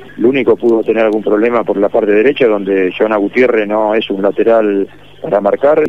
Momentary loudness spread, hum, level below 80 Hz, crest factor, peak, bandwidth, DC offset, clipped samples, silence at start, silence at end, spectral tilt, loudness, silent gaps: 4 LU; 50 Hz at -45 dBFS; -54 dBFS; 10 dB; 0 dBFS; 6 kHz; 1%; under 0.1%; 0 s; 0 s; -7.5 dB/octave; -12 LUFS; none